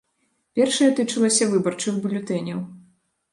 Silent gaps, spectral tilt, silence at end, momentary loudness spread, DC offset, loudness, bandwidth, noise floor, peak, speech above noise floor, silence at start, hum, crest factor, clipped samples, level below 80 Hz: none; -4 dB/octave; 0.55 s; 12 LU; under 0.1%; -21 LUFS; 11.5 kHz; -70 dBFS; -6 dBFS; 49 dB; 0.55 s; none; 16 dB; under 0.1%; -70 dBFS